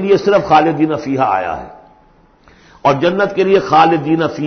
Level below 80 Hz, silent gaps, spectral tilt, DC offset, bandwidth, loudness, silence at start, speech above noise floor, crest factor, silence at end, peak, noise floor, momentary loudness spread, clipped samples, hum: -48 dBFS; none; -6.5 dB/octave; under 0.1%; 6.6 kHz; -13 LUFS; 0 s; 36 dB; 14 dB; 0 s; 0 dBFS; -49 dBFS; 7 LU; under 0.1%; none